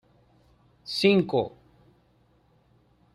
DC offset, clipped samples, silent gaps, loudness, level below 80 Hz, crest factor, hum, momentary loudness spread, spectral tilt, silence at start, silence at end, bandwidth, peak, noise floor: under 0.1%; under 0.1%; none; -25 LUFS; -64 dBFS; 22 dB; 60 Hz at -60 dBFS; 16 LU; -6 dB/octave; 0.85 s; 1.65 s; 12.5 kHz; -8 dBFS; -64 dBFS